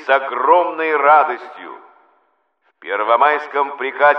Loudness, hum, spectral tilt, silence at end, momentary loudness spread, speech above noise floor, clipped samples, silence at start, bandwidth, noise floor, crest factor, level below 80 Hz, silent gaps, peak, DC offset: -15 LUFS; none; -4.5 dB/octave; 0 s; 22 LU; 48 dB; under 0.1%; 0 s; 6.2 kHz; -64 dBFS; 16 dB; -72 dBFS; none; 0 dBFS; under 0.1%